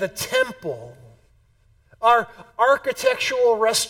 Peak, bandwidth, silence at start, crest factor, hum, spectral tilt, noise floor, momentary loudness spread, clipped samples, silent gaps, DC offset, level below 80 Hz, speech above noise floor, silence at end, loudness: -4 dBFS; 17.5 kHz; 0 s; 18 dB; none; -1.5 dB/octave; -59 dBFS; 14 LU; under 0.1%; none; under 0.1%; -58 dBFS; 38 dB; 0 s; -20 LUFS